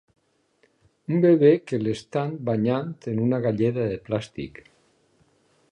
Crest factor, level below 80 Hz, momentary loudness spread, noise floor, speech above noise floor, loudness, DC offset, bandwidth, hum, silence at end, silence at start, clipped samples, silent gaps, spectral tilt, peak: 18 dB; -60 dBFS; 14 LU; -65 dBFS; 43 dB; -23 LUFS; under 0.1%; 9.8 kHz; none; 1.2 s; 1.1 s; under 0.1%; none; -8.5 dB/octave; -6 dBFS